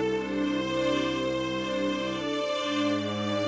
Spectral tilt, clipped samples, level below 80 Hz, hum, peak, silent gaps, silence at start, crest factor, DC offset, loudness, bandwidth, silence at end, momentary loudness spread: -5 dB/octave; under 0.1%; -56 dBFS; none; -16 dBFS; none; 0 s; 12 dB; under 0.1%; -28 LUFS; 8 kHz; 0 s; 3 LU